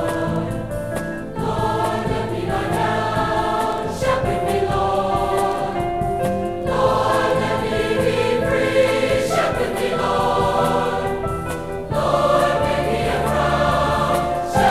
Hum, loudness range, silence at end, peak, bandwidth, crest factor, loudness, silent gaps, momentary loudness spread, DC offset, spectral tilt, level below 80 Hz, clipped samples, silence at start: none; 3 LU; 0 s; -4 dBFS; 15.5 kHz; 16 dB; -20 LUFS; none; 7 LU; under 0.1%; -5.5 dB/octave; -36 dBFS; under 0.1%; 0 s